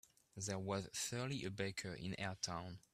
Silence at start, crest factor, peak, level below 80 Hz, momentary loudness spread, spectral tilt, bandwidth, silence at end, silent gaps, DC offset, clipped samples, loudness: 0.35 s; 20 dB; -24 dBFS; -72 dBFS; 5 LU; -4 dB/octave; 15.5 kHz; 0.15 s; none; under 0.1%; under 0.1%; -44 LUFS